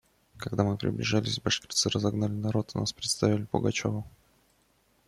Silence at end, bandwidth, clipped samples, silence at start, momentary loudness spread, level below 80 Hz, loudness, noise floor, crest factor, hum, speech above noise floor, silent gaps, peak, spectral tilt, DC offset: 1 s; 13.5 kHz; under 0.1%; 0.35 s; 7 LU; -58 dBFS; -29 LUFS; -68 dBFS; 20 dB; none; 39 dB; none; -10 dBFS; -4.5 dB/octave; under 0.1%